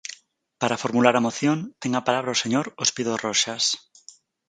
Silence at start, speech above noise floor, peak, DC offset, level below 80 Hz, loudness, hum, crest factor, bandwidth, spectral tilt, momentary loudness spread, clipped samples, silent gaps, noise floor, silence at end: 0.1 s; 29 dB; -2 dBFS; under 0.1%; -70 dBFS; -23 LUFS; none; 22 dB; 9.6 kHz; -3 dB/octave; 8 LU; under 0.1%; none; -52 dBFS; 0.7 s